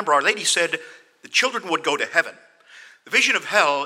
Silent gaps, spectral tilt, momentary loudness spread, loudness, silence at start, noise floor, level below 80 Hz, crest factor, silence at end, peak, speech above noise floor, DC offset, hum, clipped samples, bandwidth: none; -0.5 dB/octave; 6 LU; -20 LUFS; 0 s; -48 dBFS; -86 dBFS; 20 dB; 0 s; -2 dBFS; 27 dB; under 0.1%; none; under 0.1%; 16.5 kHz